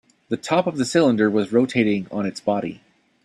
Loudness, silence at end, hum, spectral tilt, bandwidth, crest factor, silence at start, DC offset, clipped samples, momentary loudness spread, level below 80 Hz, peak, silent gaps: -21 LUFS; 0.5 s; none; -5.5 dB/octave; 12 kHz; 16 dB; 0.3 s; under 0.1%; under 0.1%; 10 LU; -62 dBFS; -4 dBFS; none